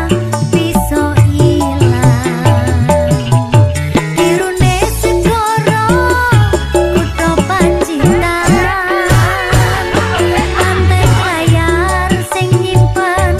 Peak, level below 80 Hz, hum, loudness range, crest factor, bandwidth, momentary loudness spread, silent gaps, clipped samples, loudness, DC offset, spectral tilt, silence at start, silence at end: 0 dBFS; -22 dBFS; none; 1 LU; 10 dB; 15 kHz; 3 LU; none; under 0.1%; -11 LUFS; under 0.1%; -5.5 dB/octave; 0 s; 0 s